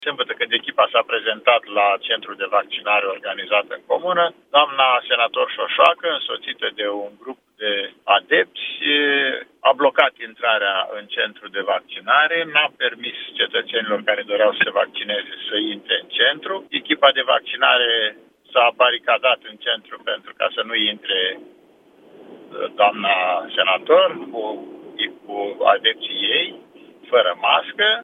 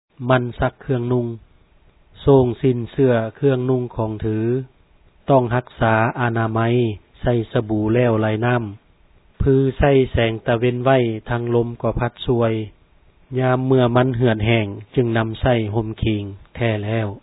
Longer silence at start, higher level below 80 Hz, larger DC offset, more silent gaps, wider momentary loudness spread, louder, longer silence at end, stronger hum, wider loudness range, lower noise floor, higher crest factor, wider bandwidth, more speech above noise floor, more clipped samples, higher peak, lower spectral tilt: second, 0 s vs 0.2 s; second, -80 dBFS vs -38 dBFS; neither; neither; about the same, 10 LU vs 8 LU; about the same, -19 LUFS vs -19 LUFS; about the same, 0 s vs 0.05 s; neither; about the same, 3 LU vs 2 LU; about the same, -52 dBFS vs -53 dBFS; about the same, 20 dB vs 18 dB; about the same, 4 kHz vs 4 kHz; about the same, 32 dB vs 35 dB; neither; about the same, 0 dBFS vs -2 dBFS; second, -4.5 dB/octave vs -11.5 dB/octave